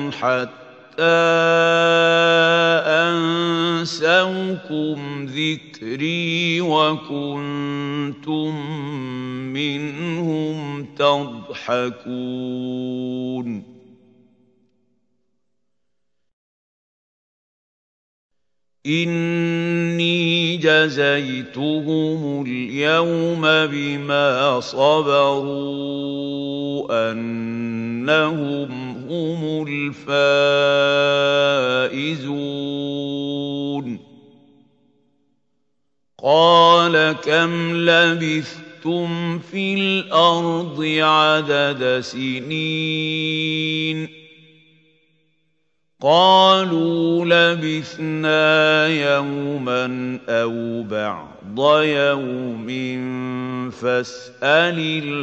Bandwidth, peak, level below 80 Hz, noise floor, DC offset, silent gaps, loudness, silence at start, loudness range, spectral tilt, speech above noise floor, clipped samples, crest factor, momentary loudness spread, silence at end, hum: 8.2 kHz; 0 dBFS; -68 dBFS; -81 dBFS; under 0.1%; 16.33-18.30 s; -19 LUFS; 0 s; 9 LU; -5.5 dB/octave; 62 dB; under 0.1%; 18 dB; 12 LU; 0 s; none